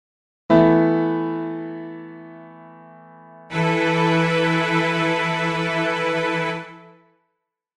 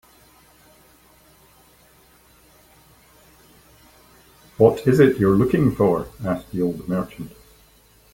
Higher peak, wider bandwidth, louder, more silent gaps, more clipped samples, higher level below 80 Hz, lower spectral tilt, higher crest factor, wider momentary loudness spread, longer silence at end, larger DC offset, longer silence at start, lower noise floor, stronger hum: about the same, -2 dBFS vs -2 dBFS; second, 11 kHz vs 17 kHz; about the same, -20 LUFS vs -19 LUFS; neither; neither; second, -56 dBFS vs -48 dBFS; second, -6.5 dB/octave vs -8 dB/octave; about the same, 20 dB vs 22 dB; first, 19 LU vs 12 LU; about the same, 0.95 s vs 0.85 s; neither; second, 0.5 s vs 4.6 s; first, -77 dBFS vs -54 dBFS; neither